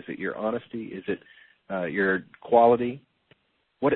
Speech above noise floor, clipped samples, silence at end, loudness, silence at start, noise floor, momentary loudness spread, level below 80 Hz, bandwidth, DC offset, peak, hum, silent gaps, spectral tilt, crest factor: 39 dB; under 0.1%; 0 s; -26 LUFS; 0.1 s; -65 dBFS; 16 LU; -64 dBFS; 4.2 kHz; under 0.1%; -6 dBFS; none; none; -10.5 dB/octave; 22 dB